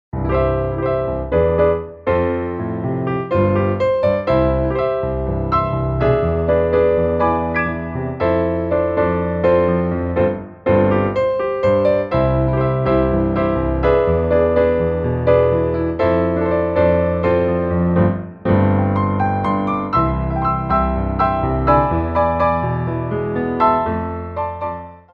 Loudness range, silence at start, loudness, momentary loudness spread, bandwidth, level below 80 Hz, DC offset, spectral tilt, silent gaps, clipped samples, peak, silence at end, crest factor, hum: 2 LU; 0.15 s; -18 LUFS; 6 LU; 5.2 kHz; -30 dBFS; under 0.1%; -10.5 dB/octave; none; under 0.1%; -2 dBFS; 0.15 s; 16 dB; none